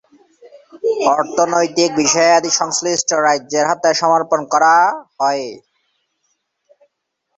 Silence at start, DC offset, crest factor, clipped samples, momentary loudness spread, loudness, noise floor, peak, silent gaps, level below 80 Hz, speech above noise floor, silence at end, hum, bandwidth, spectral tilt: 0.45 s; under 0.1%; 16 dB; under 0.1%; 7 LU; -15 LUFS; -73 dBFS; 0 dBFS; none; -64 dBFS; 59 dB; 1.8 s; none; 8.4 kHz; -2 dB/octave